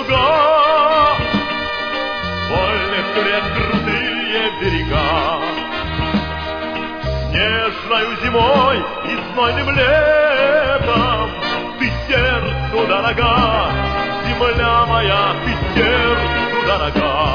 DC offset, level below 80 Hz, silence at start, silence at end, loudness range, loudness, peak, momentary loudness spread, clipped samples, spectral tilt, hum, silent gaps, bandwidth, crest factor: under 0.1%; -30 dBFS; 0 s; 0 s; 4 LU; -16 LUFS; -2 dBFS; 8 LU; under 0.1%; -6.5 dB/octave; none; none; 5.4 kHz; 14 dB